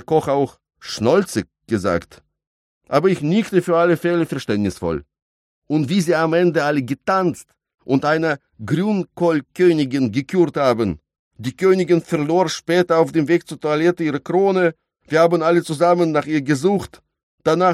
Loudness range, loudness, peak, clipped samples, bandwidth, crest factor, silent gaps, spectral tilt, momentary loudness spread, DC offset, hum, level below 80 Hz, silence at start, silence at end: 2 LU; -19 LUFS; -2 dBFS; under 0.1%; 13.5 kHz; 16 dB; 2.47-2.81 s, 5.22-5.62 s, 11.19-11.31 s, 17.23-17.38 s; -6.5 dB/octave; 8 LU; under 0.1%; none; -54 dBFS; 0.1 s; 0 s